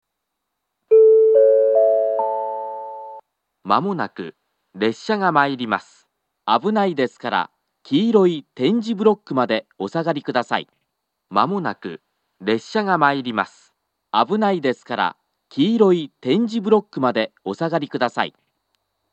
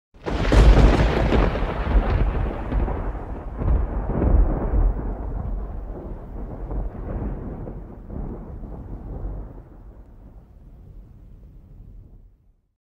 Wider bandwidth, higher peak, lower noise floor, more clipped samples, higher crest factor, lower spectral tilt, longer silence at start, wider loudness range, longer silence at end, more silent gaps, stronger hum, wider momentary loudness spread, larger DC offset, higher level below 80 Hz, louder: about the same, 8.2 kHz vs 7.8 kHz; about the same, 0 dBFS vs -2 dBFS; first, -78 dBFS vs -56 dBFS; neither; about the same, 20 dB vs 20 dB; about the same, -6.5 dB/octave vs -7.5 dB/octave; first, 0.9 s vs 0.2 s; second, 6 LU vs 19 LU; first, 0.85 s vs 0.7 s; neither; neither; second, 14 LU vs 19 LU; neither; second, -82 dBFS vs -24 dBFS; first, -19 LUFS vs -24 LUFS